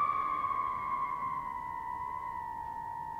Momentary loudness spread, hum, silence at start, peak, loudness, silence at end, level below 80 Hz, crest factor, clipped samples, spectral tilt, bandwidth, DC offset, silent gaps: 8 LU; none; 0 s; -22 dBFS; -36 LUFS; 0 s; -60 dBFS; 14 dB; under 0.1%; -5.5 dB/octave; 16 kHz; under 0.1%; none